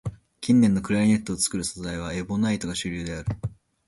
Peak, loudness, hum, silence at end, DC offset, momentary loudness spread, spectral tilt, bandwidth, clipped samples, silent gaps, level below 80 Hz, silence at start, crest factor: -8 dBFS; -25 LUFS; none; 0.35 s; under 0.1%; 14 LU; -5 dB/octave; 11.5 kHz; under 0.1%; none; -46 dBFS; 0.05 s; 16 dB